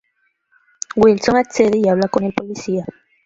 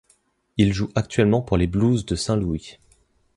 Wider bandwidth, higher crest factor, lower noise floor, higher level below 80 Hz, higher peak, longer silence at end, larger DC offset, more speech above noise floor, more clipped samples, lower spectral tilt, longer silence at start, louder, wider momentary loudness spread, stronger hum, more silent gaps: second, 7.8 kHz vs 11.5 kHz; about the same, 16 dB vs 18 dB; about the same, -66 dBFS vs -63 dBFS; second, -50 dBFS vs -38 dBFS; first, 0 dBFS vs -4 dBFS; second, 0.35 s vs 0.65 s; neither; first, 51 dB vs 43 dB; neither; about the same, -5.5 dB/octave vs -6.5 dB/octave; first, 0.95 s vs 0.55 s; first, -17 LUFS vs -22 LUFS; first, 11 LU vs 7 LU; neither; neither